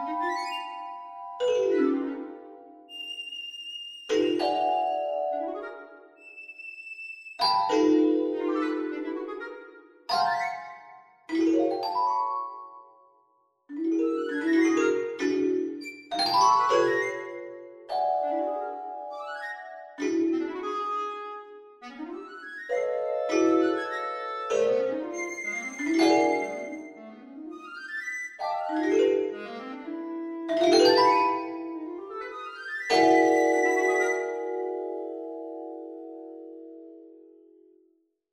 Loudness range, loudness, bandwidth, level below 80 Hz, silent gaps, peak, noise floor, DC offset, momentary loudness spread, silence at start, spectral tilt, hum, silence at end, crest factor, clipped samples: 7 LU; -27 LUFS; 12.5 kHz; -72 dBFS; none; -8 dBFS; -68 dBFS; under 0.1%; 20 LU; 0 s; -3 dB/octave; none; 1.1 s; 20 dB; under 0.1%